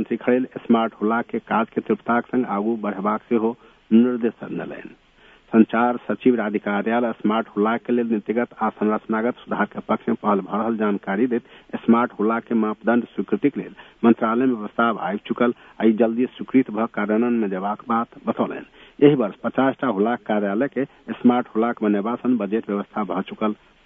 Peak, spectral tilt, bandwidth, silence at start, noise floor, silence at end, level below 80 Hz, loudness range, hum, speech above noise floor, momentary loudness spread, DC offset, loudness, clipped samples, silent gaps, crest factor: -2 dBFS; -9.5 dB/octave; 3.8 kHz; 0 s; -53 dBFS; 0.3 s; -64 dBFS; 2 LU; none; 31 dB; 8 LU; under 0.1%; -22 LUFS; under 0.1%; none; 20 dB